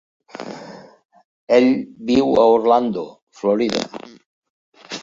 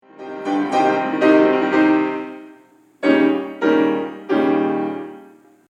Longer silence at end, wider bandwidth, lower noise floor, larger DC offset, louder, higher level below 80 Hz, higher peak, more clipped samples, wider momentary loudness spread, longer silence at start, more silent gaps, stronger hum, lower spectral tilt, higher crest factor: second, 0 s vs 0.45 s; about the same, 7.6 kHz vs 8 kHz; second, -39 dBFS vs -50 dBFS; neither; about the same, -17 LUFS vs -18 LUFS; first, -58 dBFS vs -78 dBFS; about the same, -2 dBFS vs -2 dBFS; neither; first, 22 LU vs 15 LU; first, 0.4 s vs 0.2 s; first, 1.05-1.09 s, 1.24-1.47 s, 3.22-3.27 s, 4.26-4.42 s, 4.50-4.72 s vs none; neither; about the same, -5.5 dB/octave vs -6.5 dB/octave; about the same, 18 dB vs 16 dB